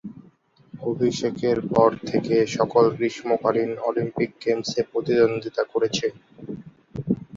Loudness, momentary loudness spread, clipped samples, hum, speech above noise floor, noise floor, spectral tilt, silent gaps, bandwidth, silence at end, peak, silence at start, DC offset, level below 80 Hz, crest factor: -23 LUFS; 17 LU; under 0.1%; none; 33 dB; -56 dBFS; -5.5 dB/octave; none; 7.6 kHz; 0 s; -4 dBFS; 0.05 s; under 0.1%; -58 dBFS; 20 dB